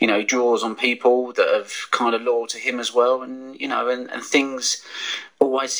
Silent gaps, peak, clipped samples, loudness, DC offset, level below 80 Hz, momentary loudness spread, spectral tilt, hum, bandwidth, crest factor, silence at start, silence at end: none; 0 dBFS; under 0.1%; -21 LUFS; under 0.1%; -72 dBFS; 8 LU; -1.5 dB/octave; none; over 20 kHz; 20 dB; 0 s; 0 s